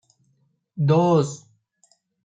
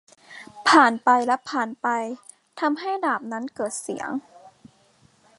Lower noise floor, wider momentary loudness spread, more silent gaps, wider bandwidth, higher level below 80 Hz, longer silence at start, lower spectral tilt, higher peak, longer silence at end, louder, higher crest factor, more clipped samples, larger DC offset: first, -67 dBFS vs -59 dBFS; first, 23 LU vs 18 LU; neither; second, 8.8 kHz vs 11.5 kHz; first, -66 dBFS vs -74 dBFS; first, 0.75 s vs 0.3 s; first, -7.5 dB/octave vs -2.5 dB/octave; second, -8 dBFS vs -2 dBFS; about the same, 0.9 s vs 0.9 s; first, -20 LUFS vs -23 LUFS; second, 16 dB vs 22 dB; neither; neither